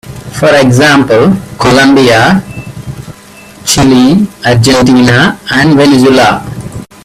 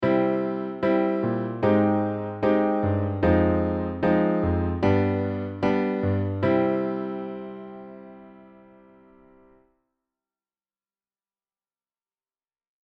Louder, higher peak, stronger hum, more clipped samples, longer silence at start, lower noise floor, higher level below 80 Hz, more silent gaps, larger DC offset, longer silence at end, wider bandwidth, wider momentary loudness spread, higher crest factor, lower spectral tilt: first, -6 LUFS vs -24 LUFS; first, 0 dBFS vs -8 dBFS; neither; first, 0.4% vs under 0.1%; about the same, 0.05 s vs 0 s; second, -32 dBFS vs under -90 dBFS; first, -34 dBFS vs -48 dBFS; neither; neither; second, 0.2 s vs 4.4 s; first, 15 kHz vs 6.2 kHz; first, 18 LU vs 12 LU; second, 6 dB vs 18 dB; second, -5 dB/octave vs -10 dB/octave